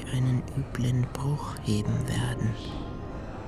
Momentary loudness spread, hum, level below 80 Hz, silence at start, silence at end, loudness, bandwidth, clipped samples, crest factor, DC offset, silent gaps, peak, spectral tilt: 10 LU; none; -42 dBFS; 0 s; 0 s; -30 LUFS; 13.5 kHz; under 0.1%; 14 dB; 0.1%; none; -14 dBFS; -6.5 dB/octave